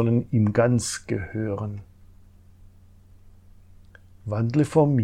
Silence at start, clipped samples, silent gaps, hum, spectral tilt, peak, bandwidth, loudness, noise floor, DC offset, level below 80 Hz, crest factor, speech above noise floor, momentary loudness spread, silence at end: 0 s; under 0.1%; none; none; -7 dB/octave; -8 dBFS; 13 kHz; -24 LUFS; -51 dBFS; under 0.1%; -52 dBFS; 18 dB; 28 dB; 13 LU; 0 s